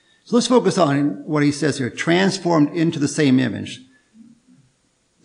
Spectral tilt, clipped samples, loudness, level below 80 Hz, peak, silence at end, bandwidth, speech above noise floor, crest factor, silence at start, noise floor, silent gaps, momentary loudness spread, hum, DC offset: -5.5 dB/octave; under 0.1%; -18 LUFS; -66 dBFS; -2 dBFS; 1.45 s; 10.5 kHz; 46 dB; 18 dB; 0.3 s; -64 dBFS; none; 7 LU; none; under 0.1%